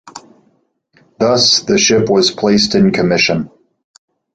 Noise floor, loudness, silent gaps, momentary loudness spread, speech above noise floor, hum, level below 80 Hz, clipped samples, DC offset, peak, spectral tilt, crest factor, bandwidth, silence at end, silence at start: -59 dBFS; -12 LUFS; none; 6 LU; 47 dB; none; -48 dBFS; under 0.1%; under 0.1%; 0 dBFS; -3.5 dB/octave; 14 dB; 9.2 kHz; 0.9 s; 0.05 s